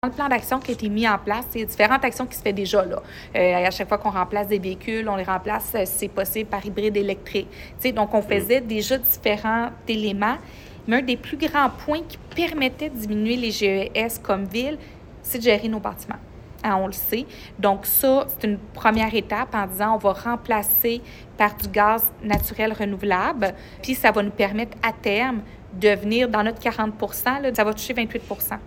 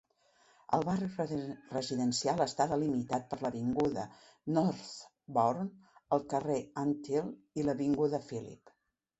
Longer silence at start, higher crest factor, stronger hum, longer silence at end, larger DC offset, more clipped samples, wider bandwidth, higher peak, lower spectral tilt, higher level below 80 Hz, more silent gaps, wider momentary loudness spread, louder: second, 0.05 s vs 0.7 s; about the same, 22 dB vs 20 dB; neither; second, 0 s vs 0.65 s; neither; neither; first, 17 kHz vs 8.2 kHz; first, -2 dBFS vs -14 dBFS; second, -4 dB/octave vs -6 dB/octave; first, -44 dBFS vs -68 dBFS; neither; about the same, 9 LU vs 11 LU; first, -22 LUFS vs -34 LUFS